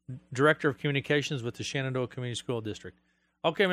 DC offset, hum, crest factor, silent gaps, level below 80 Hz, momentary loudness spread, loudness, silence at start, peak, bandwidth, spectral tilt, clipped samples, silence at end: under 0.1%; none; 20 dB; none; -68 dBFS; 14 LU; -30 LUFS; 0.1 s; -10 dBFS; 13.5 kHz; -5 dB/octave; under 0.1%; 0 s